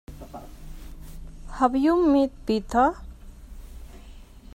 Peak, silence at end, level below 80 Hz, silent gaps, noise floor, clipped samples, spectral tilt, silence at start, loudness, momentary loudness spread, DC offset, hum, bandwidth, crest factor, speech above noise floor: -8 dBFS; 0.15 s; -42 dBFS; none; -45 dBFS; under 0.1%; -6.5 dB/octave; 0.1 s; -22 LUFS; 25 LU; under 0.1%; none; 15.5 kHz; 18 dB; 23 dB